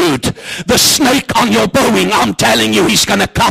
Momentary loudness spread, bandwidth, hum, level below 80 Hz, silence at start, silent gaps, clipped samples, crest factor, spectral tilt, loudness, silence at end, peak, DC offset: 5 LU; 15.5 kHz; none; -36 dBFS; 0 s; none; under 0.1%; 12 dB; -3 dB/octave; -10 LUFS; 0 s; 0 dBFS; under 0.1%